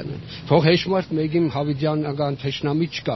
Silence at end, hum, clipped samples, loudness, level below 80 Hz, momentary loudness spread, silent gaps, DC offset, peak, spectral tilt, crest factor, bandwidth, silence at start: 0 s; none; under 0.1%; -21 LUFS; -52 dBFS; 7 LU; none; under 0.1%; -2 dBFS; -5.5 dB/octave; 18 dB; 6.2 kHz; 0 s